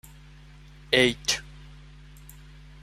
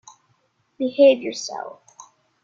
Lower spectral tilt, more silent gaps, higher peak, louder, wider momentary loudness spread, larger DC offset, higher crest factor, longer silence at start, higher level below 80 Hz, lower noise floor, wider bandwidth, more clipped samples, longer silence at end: about the same, -2.5 dB/octave vs -3 dB/octave; neither; about the same, -4 dBFS vs -4 dBFS; second, -24 LUFS vs -19 LUFS; first, 27 LU vs 18 LU; neither; first, 26 dB vs 18 dB; about the same, 0.9 s vs 0.8 s; first, -50 dBFS vs -72 dBFS; second, -49 dBFS vs -66 dBFS; first, 16 kHz vs 7.6 kHz; neither; first, 1.15 s vs 0.75 s